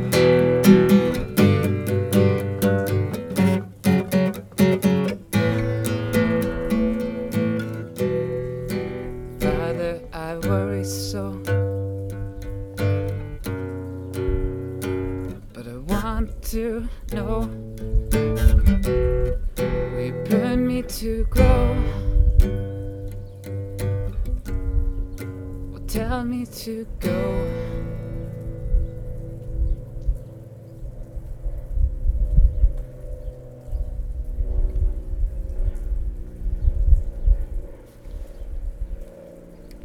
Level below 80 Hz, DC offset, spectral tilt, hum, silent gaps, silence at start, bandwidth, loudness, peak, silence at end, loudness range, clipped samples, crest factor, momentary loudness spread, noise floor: -26 dBFS; under 0.1%; -7 dB/octave; none; none; 0 s; 19.5 kHz; -24 LUFS; 0 dBFS; 0 s; 8 LU; under 0.1%; 22 dB; 16 LU; -42 dBFS